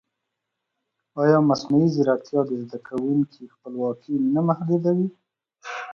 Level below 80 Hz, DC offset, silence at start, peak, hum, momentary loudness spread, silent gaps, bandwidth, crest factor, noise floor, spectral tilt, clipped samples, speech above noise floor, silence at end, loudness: -68 dBFS; under 0.1%; 1.15 s; -4 dBFS; none; 15 LU; none; 7 kHz; 18 dB; -81 dBFS; -8 dB/octave; under 0.1%; 59 dB; 0 s; -23 LUFS